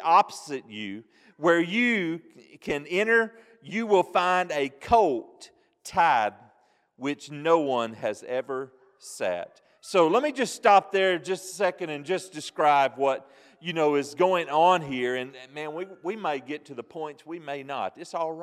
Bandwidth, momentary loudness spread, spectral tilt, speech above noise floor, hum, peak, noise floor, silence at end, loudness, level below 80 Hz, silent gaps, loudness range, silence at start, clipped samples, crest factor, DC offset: 14.5 kHz; 15 LU; -4.5 dB/octave; 39 dB; none; -6 dBFS; -64 dBFS; 0 s; -26 LUFS; -62 dBFS; none; 5 LU; 0 s; under 0.1%; 20 dB; under 0.1%